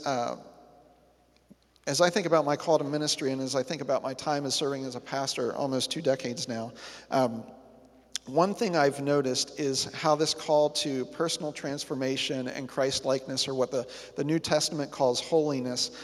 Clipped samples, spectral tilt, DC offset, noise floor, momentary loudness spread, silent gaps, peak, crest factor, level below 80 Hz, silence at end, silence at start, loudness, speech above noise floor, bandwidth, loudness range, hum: under 0.1%; -3.5 dB/octave; under 0.1%; -63 dBFS; 9 LU; none; -8 dBFS; 22 dB; -68 dBFS; 0 s; 0 s; -29 LUFS; 34 dB; 14.5 kHz; 3 LU; none